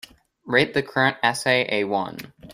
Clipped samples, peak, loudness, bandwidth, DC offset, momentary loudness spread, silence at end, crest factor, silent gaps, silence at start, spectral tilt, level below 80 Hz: under 0.1%; -4 dBFS; -21 LUFS; 16 kHz; under 0.1%; 8 LU; 0 s; 20 dB; none; 0.45 s; -4 dB/octave; -60 dBFS